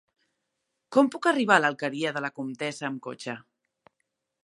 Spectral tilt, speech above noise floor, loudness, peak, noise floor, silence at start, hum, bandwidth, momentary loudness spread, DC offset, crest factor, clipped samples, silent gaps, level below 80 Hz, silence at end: -4.5 dB/octave; 55 dB; -26 LUFS; -4 dBFS; -81 dBFS; 0.9 s; none; 11.5 kHz; 15 LU; under 0.1%; 24 dB; under 0.1%; none; -82 dBFS; 1.05 s